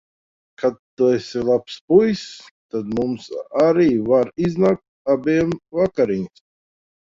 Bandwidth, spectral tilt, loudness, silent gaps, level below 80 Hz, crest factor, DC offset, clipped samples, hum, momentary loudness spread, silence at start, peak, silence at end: 7.6 kHz; -7 dB/octave; -20 LUFS; 0.79-0.97 s, 1.81-1.88 s, 2.51-2.69 s, 4.88-5.05 s; -54 dBFS; 18 dB; under 0.1%; under 0.1%; none; 11 LU; 0.6 s; -2 dBFS; 0.8 s